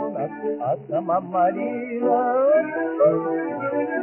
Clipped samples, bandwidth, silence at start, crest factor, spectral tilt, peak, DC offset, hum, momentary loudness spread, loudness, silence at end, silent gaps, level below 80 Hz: under 0.1%; 3.1 kHz; 0 s; 14 dB; -7 dB/octave; -8 dBFS; under 0.1%; none; 8 LU; -22 LUFS; 0 s; none; -70 dBFS